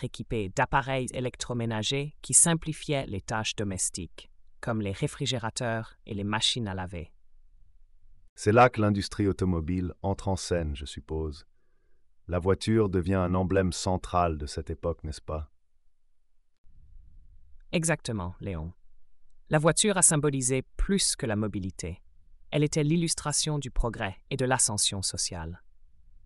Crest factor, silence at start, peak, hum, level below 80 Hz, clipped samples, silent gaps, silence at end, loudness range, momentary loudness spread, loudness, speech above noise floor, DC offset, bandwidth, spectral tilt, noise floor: 22 dB; 0 s; -8 dBFS; none; -44 dBFS; under 0.1%; 8.29-8.36 s, 16.58-16.64 s; 0.1 s; 9 LU; 15 LU; -28 LUFS; 33 dB; under 0.1%; 13.5 kHz; -4 dB/octave; -61 dBFS